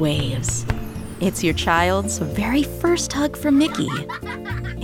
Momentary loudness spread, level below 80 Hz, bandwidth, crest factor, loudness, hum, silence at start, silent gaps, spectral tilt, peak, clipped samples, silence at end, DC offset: 11 LU; -36 dBFS; 17 kHz; 18 dB; -21 LUFS; none; 0 s; none; -4.5 dB/octave; -4 dBFS; under 0.1%; 0 s; under 0.1%